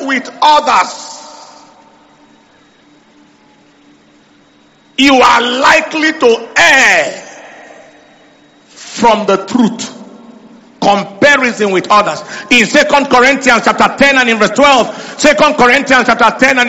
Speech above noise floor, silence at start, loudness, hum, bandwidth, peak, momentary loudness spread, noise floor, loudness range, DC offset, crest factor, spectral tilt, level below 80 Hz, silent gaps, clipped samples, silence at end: 37 dB; 0 s; -8 LUFS; none; 17 kHz; 0 dBFS; 12 LU; -46 dBFS; 8 LU; under 0.1%; 12 dB; -3 dB/octave; -44 dBFS; none; 0.5%; 0 s